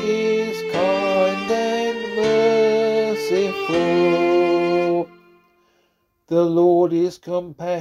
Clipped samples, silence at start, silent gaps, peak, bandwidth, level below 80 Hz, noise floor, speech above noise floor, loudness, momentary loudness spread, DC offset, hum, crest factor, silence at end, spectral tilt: under 0.1%; 0 s; none; -6 dBFS; 12.5 kHz; -60 dBFS; -66 dBFS; 47 dB; -19 LUFS; 7 LU; under 0.1%; none; 14 dB; 0 s; -6 dB/octave